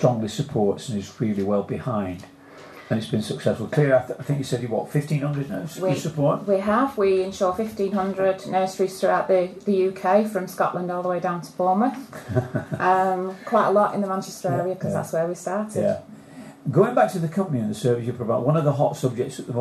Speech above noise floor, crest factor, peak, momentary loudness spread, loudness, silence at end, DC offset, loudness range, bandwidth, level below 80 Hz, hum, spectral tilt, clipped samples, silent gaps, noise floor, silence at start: 21 dB; 20 dB; -4 dBFS; 8 LU; -23 LUFS; 0 s; under 0.1%; 3 LU; 13.5 kHz; -62 dBFS; none; -7 dB/octave; under 0.1%; none; -44 dBFS; 0 s